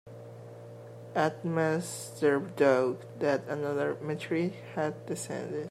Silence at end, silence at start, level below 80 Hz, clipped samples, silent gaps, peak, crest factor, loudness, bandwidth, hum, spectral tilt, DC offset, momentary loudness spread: 0 s; 0.05 s; -78 dBFS; under 0.1%; none; -12 dBFS; 20 dB; -31 LUFS; 15 kHz; none; -5.5 dB/octave; under 0.1%; 21 LU